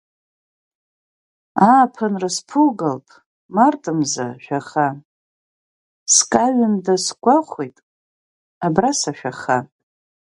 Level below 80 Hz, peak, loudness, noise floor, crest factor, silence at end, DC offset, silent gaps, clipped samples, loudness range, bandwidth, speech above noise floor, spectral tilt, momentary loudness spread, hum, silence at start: -64 dBFS; 0 dBFS; -18 LUFS; under -90 dBFS; 20 dB; 0.7 s; under 0.1%; 3.26-3.49 s, 5.05-6.06 s, 7.83-8.61 s; under 0.1%; 3 LU; 11.5 kHz; over 72 dB; -3.5 dB/octave; 14 LU; none; 1.55 s